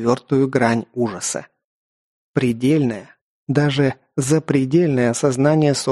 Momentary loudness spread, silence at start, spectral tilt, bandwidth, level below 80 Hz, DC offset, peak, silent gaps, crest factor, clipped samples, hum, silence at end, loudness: 8 LU; 0 s; -6 dB/octave; 12.5 kHz; -56 dBFS; under 0.1%; -2 dBFS; 1.64-2.34 s, 3.21-3.47 s; 18 dB; under 0.1%; none; 0 s; -19 LUFS